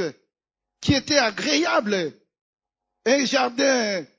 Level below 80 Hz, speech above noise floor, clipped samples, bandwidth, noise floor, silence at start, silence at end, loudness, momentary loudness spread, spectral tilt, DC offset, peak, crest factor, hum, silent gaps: -50 dBFS; 49 dB; under 0.1%; 7.8 kHz; -70 dBFS; 0 s; 0.15 s; -21 LUFS; 9 LU; -3.5 dB/octave; under 0.1%; -4 dBFS; 20 dB; none; 2.41-2.53 s